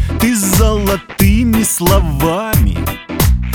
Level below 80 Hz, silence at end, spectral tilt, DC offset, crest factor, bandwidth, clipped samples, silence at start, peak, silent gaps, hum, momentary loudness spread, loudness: -18 dBFS; 0 s; -5 dB/octave; under 0.1%; 12 dB; over 20 kHz; under 0.1%; 0 s; 0 dBFS; none; none; 5 LU; -13 LUFS